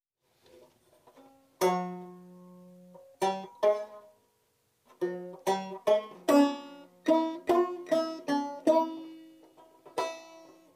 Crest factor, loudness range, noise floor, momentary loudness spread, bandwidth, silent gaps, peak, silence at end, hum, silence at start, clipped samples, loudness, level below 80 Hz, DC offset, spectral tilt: 20 dB; 7 LU; -73 dBFS; 19 LU; 15.5 kHz; none; -12 dBFS; 0.35 s; none; 1.6 s; under 0.1%; -30 LUFS; -82 dBFS; under 0.1%; -5 dB/octave